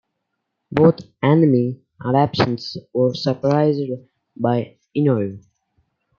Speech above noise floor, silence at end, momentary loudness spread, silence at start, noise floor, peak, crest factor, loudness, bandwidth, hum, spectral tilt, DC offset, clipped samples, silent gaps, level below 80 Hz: 58 dB; 0.8 s; 12 LU; 0.7 s; -76 dBFS; -2 dBFS; 18 dB; -19 LUFS; 7 kHz; none; -8.5 dB/octave; under 0.1%; under 0.1%; none; -56 dBFS